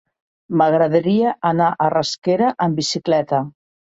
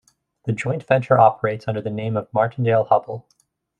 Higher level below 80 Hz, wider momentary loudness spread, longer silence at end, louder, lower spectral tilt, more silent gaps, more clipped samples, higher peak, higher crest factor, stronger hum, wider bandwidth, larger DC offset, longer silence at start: about the same, -62 dBFS vs -60 dBFS; second, 6 LU vs 12 LU; second, 0.45 s vs 0.6 s; about the same, -18 LUFS vs -20 LUFS; second, -5.5 dB/octave vs -8 dB/octave; first, 2.18-2.22 s vs none; neither; about the same, -4 dBFS vs -2 dBFS; about the same, 16 dB vs 18 dB; neither; second, 8.2 kHz vs 9.4 kHz; neither; about the same, 0.5 s vs 0.45 s